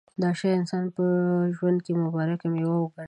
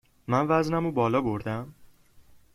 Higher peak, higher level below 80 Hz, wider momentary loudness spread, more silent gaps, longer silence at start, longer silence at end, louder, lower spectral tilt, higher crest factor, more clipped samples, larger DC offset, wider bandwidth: about the same, -12 dBFS vs -10 dBFS; second, -72 dBFS vs -56 dBFS; second, 3 LU vs 11 LU; neither; about the same, 0.2 s vs 0.3 s; second, 0 s vs 0.7 s; about the same, -26 LUFS vs -27 LUFS; about the same, -8.5 dB/octave vs -7.5 dB/octave; second, 12 dB vs 18 dB; neither; neither; second, 9 kHz vs 14.5 kHz